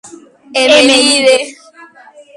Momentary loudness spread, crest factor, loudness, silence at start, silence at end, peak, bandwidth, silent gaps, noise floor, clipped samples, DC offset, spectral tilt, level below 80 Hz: 12 LU; 12 dB; -8 LUFS; 0.05 s; 0.85 s; 0 dBFS; 11.5 kHz; none; -39 dBFS; under 0.1%; under 0.1%; -0.5 dB/octave; -56 dBFS